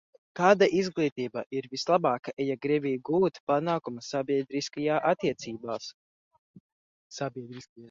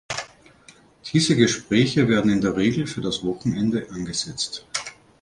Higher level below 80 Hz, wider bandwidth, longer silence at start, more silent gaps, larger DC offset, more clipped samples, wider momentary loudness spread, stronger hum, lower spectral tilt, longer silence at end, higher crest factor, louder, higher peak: second, -72 dBFS vs -52 dBFS; second, 7.6 kHz vs 11.5 kHz; first, 0.35 s vs 0.1 s; first, 1.12-1.16 s, 1.46-1.50 s, 2.33-2.37 s, 3.40-3.47 s, 5.94-6.31 s, 6.38-6.54 s, 6.60-7.10 s, 7.69-7.76 s vs none; neither; neither; about the same, 13 LU vs 12 LU; neither; about the same, -5.5 dB/octave vs -5 dB/octave; second, 0 s vs 0.3 s; about the same, 22 dB vs 20 dB; second, -28 LUFS vs -22 LUFS; about the same, -6 dBFS vs -4 dBFS